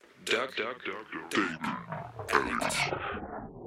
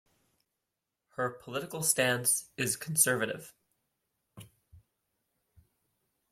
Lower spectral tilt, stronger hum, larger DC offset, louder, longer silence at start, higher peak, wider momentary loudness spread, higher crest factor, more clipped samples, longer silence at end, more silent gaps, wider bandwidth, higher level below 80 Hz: about the same, -3.5 dB/octave vs -2.5 dB/octave; neither; neither; second, -32 LUFS vs -29 LUFS; second, 0.15 s vs 1.2 s; about the same, -8 dBFS vs -10 dBFS; about the same, 11 LU vs 12 LU; about the same, 26 dB vs 26 dB; neither; second, 0 s vs 1.5 s; neither; about the same, 16 kHz vs 16.5 kHz; first, -58 dBFS vs -74 dBFS